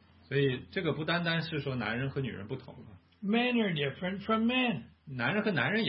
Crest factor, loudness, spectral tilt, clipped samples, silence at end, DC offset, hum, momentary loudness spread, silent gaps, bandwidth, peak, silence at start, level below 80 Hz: 18 dB; -32 LUFS; -10 dB/octave; under 0.1%; 0 s; under 0.1%; none; 12 LU; none; 5.8 kHz; -14 dBFS; 0.3 s; -66 dBFS